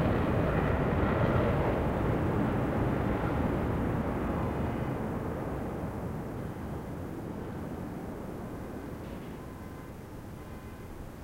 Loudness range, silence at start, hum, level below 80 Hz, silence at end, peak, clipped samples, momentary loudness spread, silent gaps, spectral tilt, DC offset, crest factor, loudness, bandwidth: 12 LU; 0 s; none; -42 dBFS; 0 s; -14 dBFS; under 0.1%; 16 LU; none; -8.5 dB/octave; under 0.1%; 18 dB; -32 LUFS; 16 kHz